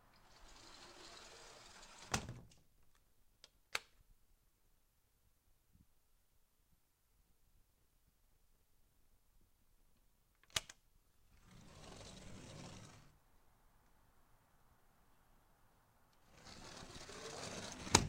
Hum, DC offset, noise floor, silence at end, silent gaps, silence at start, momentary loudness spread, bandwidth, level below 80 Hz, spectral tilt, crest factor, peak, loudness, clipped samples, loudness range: none; under 0.1%; -76 dBFS; 0 s; none; 0 s; 22 LU; 16 kHz; -66 dBFS; -2.5 dB/octave; 44 dB; -6 dBFS; -47 LUFS; under 0.1%; 11 LU